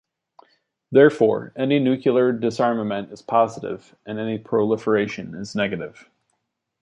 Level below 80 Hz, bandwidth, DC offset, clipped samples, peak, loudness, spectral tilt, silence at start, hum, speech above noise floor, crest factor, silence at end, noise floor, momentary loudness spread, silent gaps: -62 dBFS; 8.8 kHz; under 0.1%; under 0.1%; -2 dBFS; -21 LUFS; -7 dB/octave; 0.9 s; none; 55 dB; 20 dB; 0.95 s; -75 dBFS; 16 LU; none